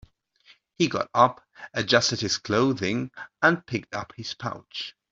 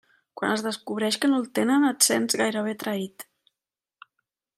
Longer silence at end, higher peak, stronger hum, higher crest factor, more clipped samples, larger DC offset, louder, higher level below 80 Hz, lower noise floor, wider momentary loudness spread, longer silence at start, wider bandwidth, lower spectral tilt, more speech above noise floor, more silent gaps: second, 0.2 s vs 1.35 s; about the same, -4 dBFS vs -4 dBFS; neither; about the same, 22 dB vs 22 dB; neither; neither; about the same, -25 LUFS vs -24 LUFS; first, -62 dBFS vs -78 dBFS; second, -59 dBFS vs -89 dBFS; about the same, 14 LU vs 12 LU; first, 0.8 s vs 0.35 s; second, 8 kHz vs 15.5 kHz; first, -4 dB/octave vs -2.5 dB/octave; second, 34 dB vs 65 dB; neither